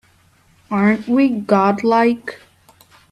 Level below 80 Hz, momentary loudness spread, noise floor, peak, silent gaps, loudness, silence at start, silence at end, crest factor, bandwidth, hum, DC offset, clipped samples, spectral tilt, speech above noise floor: -60 dBFS; 10 LU; -54 dBFS; -2 dBFS; none; -16 LUFS; 0.7 s; 0.75 s; 16 dB; 12.5 kHz; none; under 0.1%; under 0.1%; -7.5 dB/octave; 39 dB